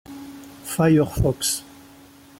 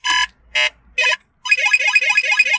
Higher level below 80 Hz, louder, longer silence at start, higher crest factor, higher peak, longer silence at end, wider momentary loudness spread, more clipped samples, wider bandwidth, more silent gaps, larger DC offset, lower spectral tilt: first, -42 dBFS vs -56 dBFS; second, -21 LUFS vs -15 LUFS; about the same, 0.1 s vs 0.05 s; about the same, 16 dB vs 16 dB; second, -8 dBFS vs -2 dBFS; first, 0.75 s vs 0 s; first, 21 LU vs 6 LU; neither; first, 17 kHz vs 8 kHz; neither; neither; first, -5 dB/octave vs 2.5 dB/octave